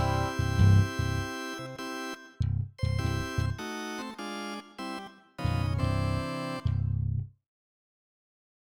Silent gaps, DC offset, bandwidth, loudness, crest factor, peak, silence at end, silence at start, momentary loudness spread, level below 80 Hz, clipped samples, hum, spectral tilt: none; under 0.1%; 13.5 kHz; -31 LUFS; 20 dB; -10 dBFS; 1.4 s; 0 s; 13 LU; -42 dBFS; under 0.1%; none; -6 dB/octave